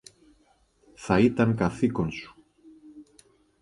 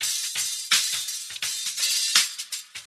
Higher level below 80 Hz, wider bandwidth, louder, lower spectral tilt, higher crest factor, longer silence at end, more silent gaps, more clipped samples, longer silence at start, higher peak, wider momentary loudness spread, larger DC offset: first, -52 dBFS vs -78 dBFS; second, 11.5 kHz vs over 20 kHz; about the same, -25 LUFS vs -23 LUFS; first, -7.5 dB/octave vs 4 dB/octave; about the same, 22 dB vs 26 dB; first, 0.6 s vs 0.1 s; neither; neither; first, 1 s vs 0 s; second, -8 dBFS vs -2 dBFS; first, 20 LU vs 12 LU; neither